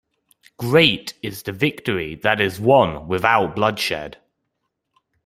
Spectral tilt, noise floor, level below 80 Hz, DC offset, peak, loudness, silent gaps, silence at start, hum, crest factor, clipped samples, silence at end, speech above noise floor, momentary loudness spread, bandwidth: -5 dB/octave; -76 dBFS; -52 dBFS; under 0.1%; 0 dBFS; -19 LUFS; none; 0.6 s; none; 20 dB; under 0.1%; 1.15 s; 57 dB; 14 LU; 16 kHz